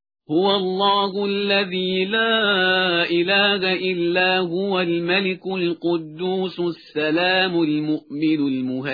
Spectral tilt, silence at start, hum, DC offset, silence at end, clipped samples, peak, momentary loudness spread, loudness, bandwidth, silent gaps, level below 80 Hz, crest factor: -7.5 dB/octave; 0.3 s; none; under 0.1%; 0 s; under 0.1%; -4 dBFS; 7 LU; -20 LUFS; 5 kHz; none; -66 dBFS; 16 dB